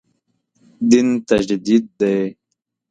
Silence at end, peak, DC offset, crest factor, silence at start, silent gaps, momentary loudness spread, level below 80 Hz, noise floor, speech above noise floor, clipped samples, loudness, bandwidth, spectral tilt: 0.6 s; 0 dBFS; under 0.1%; 18 dB; 0.8 s; none; 8 LU; -54 dBFS; -76 dBFS; 60 dB; under 0.1%; -17 LUFS; 9.2 kHz; -5.5 dB/octave